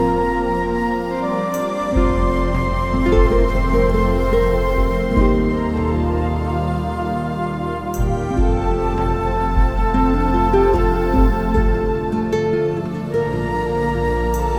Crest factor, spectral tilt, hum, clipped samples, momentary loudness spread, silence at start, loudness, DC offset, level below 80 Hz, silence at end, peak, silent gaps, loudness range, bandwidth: 14 dB; -7.5 dB/octave; none; under 0.1%; 6 LU; 0 s; -19 LUFS; under 0.1%; -22 dBFS; 0 s; -2 dBFS; none; 3 LU; 14.5 kHz